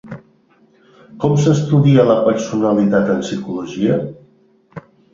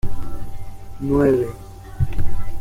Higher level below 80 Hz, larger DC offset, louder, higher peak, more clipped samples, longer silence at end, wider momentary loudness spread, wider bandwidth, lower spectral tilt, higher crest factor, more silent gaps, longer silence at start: second, -52 dBFS vs -28 dBFS; neither; first, -15 LUFS vs -22 LUFS; about the same, -2 dBFS vs -4 dBFS; neither; first, 0.35 s vs 0 s; second, 13 LU vs 22 LU; second, 7.6 kHz vs 9.6 kHz; about the same, -7.5 dB/octave vs -8.5 dB/octave; about the same, 16 dB vs 12 dB; neither; about the same, 0.05 s vs 0.05 s